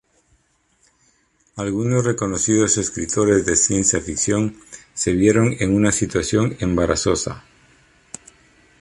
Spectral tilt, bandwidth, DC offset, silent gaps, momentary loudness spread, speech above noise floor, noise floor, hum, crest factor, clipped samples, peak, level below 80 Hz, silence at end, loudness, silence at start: -4.5 dB/octave; 11.5 kHz; under 0.1%; none; 20 LU; 44 dB; -62 dBFS; none; 18 dB; under 0.1%; -4 dBFS; -42 dBFS; 1.4 s; -19 LUFS; 1.55 s